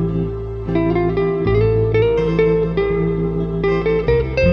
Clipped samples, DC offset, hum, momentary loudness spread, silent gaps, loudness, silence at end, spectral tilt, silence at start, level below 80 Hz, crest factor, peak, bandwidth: under 0.1%; under 0.1%; none; 5 LU; none; -18 LUFS; 0 s; -9.5 dB/octave; 0 s; -28 dBFS; 12 dB; -4 dBFS; 6.2 kHz